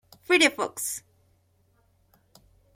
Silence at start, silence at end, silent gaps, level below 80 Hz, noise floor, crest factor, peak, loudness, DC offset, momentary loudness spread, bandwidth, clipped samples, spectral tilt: 0.3 s; 1.75 s; none; -68 dBFS; -66 dBFS; 24 dB; -6 dBFS; -24 LUFS; under 0.1%; 12 LU; 16.5 kHz; under 0.1%; -1 dB/octave